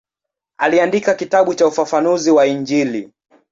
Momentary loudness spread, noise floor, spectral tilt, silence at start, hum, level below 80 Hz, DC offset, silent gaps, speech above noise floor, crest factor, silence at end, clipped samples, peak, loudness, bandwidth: 5 LU; -83 dBFS; -4.5 dB/octave; 0.6 s; none; -62 dBFS; under 0.1%; none; 69 dB; 14 dB; 0.45 s; under 0.1%; -2 dBFS; -15 LUFS; 7.8 kHz